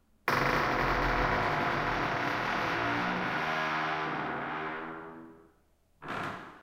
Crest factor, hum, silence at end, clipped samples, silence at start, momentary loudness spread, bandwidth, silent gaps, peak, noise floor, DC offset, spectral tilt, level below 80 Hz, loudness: 22 dB; none; 0 s; under 0.1%; 0.25 s; 12 LU; 16.5 kHz; none; -10 dBFS; -67 dBFS; under 0.1%; -5 dB/octave; -48 dBFS; -31 LUFS